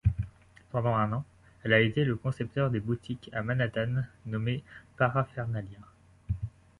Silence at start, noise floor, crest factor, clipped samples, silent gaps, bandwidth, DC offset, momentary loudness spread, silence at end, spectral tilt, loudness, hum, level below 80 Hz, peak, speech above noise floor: 0.05 s; -50 dBFS; 20 dB; under 0.1%; none; 10 kHz; under 0.1%; 12 LU; 0.3 s; -8 dB/octave; -31 LUFS; none; -46 dBFS; -10 dBFS; 20 dB